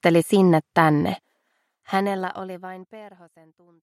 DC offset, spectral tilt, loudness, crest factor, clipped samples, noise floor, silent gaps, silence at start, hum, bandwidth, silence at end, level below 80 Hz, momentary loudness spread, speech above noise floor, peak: under 0.1%; -6.5 dB/octave; -21 LUFS; 20 dB; under 0.1%; -72 dBFS; none; 0.05 s; none; 14.5 kHz; 0.75 s; -66 dBFS; 20 LU; 50 dB; -4 dBFS